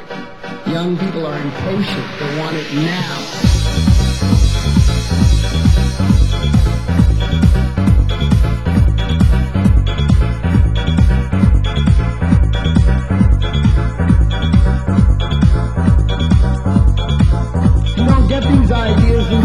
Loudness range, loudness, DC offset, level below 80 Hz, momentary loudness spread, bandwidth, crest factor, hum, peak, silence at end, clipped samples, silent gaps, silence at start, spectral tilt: 2 LU; -14 LUFS; 2%; -16 dBFS; 6 LU; 12 kHz; 12 dB; none; 0 dBFS; 0 s; under 0.1%; none; 0 s; -7 dB/octave